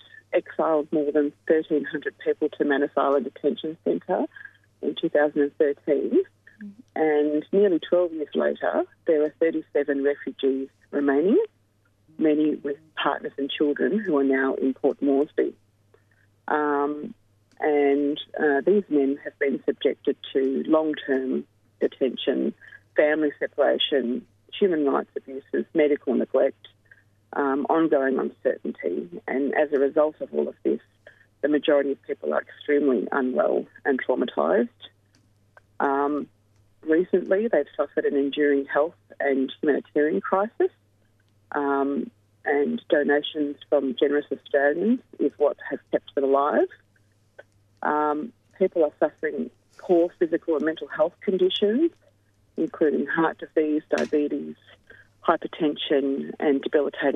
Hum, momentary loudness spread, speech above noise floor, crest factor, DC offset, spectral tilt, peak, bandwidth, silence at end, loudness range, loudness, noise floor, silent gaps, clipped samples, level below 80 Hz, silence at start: none; 8 LU; 41 dB; 20 dB; under 0.1%; -7 dB/octave; -4 dBFS; 6.4 kHz; 0 s; 2 LU; -24 LUFS; -64 dBFS; none; under 0.1%; -74 dBFS; 0.3 s